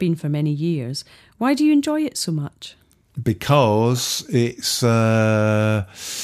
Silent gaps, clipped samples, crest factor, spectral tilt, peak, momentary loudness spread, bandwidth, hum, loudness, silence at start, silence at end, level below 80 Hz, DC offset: none; under 0.1%; 18 dB; -5.5 dB/octave; -2 dBFS; 12 LU; 15.5 kHz; none; -20 LUFS; 0 s; 0 s; -56 dBFS; under 0.1%